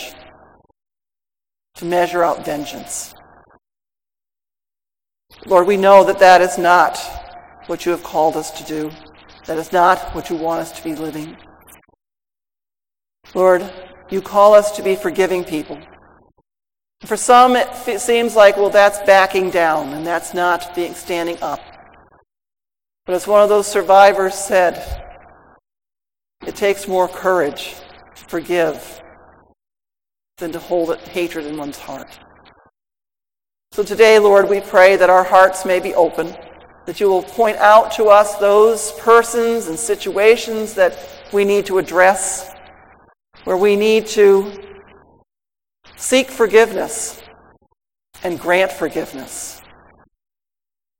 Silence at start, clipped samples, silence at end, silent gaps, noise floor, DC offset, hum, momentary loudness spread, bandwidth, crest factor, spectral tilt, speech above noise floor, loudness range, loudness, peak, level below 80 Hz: 0 s; under 0.1%; 1.45 s; none; under -90 dBFS; under 0.1%; none; 19 LU; 17 kHz; 16 dB; -3.5 dB/octave; over 76 dB; 11 LU; -14 LUFS; 0 dBFS; -48 dBFS